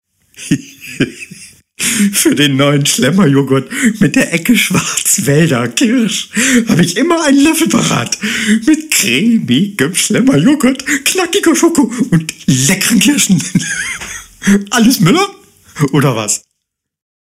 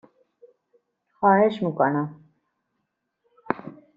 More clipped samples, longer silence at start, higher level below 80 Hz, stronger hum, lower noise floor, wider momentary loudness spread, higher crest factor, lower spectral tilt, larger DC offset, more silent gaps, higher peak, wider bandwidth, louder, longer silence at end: neither; second, 0.4 s vs 1.2 s; first, -46 dBFS vs -70 dBFS; neither; second, -74 dBFS vs -78 dBFS; second, 9 LU vs 13 LU; second, 12 dB vs 24 dB; second, -4 dB/octave vs -6 dB/octave; neither; neither; first, 0 dBFS vs -4 dBFS; first, 16 kHz vs 7 kHz; first, -11 LUFS vs -23 LUFS; first, 0.8 s vs 0.25 s